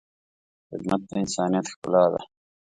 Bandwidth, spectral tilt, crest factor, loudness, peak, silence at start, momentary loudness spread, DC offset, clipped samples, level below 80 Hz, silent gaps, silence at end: 11 kHz; -5.5 dB/octave; 20 dB; -25 LUFS; -6 dBFS; 0.7 s; 13 LU; under 0.1%; under 0.1%; -62 dBFS; 1.76-1.82 s; 0.55 s